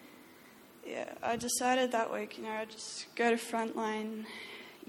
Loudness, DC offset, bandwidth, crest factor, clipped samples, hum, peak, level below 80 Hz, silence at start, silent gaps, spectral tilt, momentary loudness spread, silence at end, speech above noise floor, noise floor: -35 LUFS; under 0.1%; 19 kHz; 20 dB; under 0.1%; none; -16 dBFS; -74 dBFS; 0 s; none; -2.5 dB/octave; 15 LU; 0 s; 22 dB; -57 dBFS